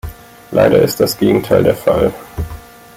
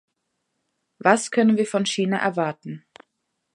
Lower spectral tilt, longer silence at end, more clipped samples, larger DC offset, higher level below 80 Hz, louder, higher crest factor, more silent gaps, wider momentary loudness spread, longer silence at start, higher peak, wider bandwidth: first, -6 dB/octave vs -4.5 dB/octave; second, 0.35 s vs 0.75 s; neither; neither; first, -34 dBFS vs -74 dBFS; first, -13 LUFS vs -21 LUFS; second, 14 dB vs 24 dB; neither; about the same, 16 LU vs 17 LU; second, 0.05 s vs 1 s; about the same, 0 dBFS vs 0 dBFS; first, 16.5 kHz vs 11.5 kHz